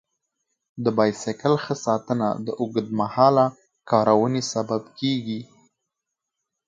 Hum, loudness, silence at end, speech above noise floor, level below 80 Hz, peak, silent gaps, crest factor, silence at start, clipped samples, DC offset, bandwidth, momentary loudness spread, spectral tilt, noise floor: none; -23 LUFS; 1.25 s; 62 dB; -66 dBFS; -2 dBFS; none; 20 dB; 0.75 s; under 0.1%; under 0.1%; 9.2 kHz; 9 LU; -6 dB/octave; -84 dBFS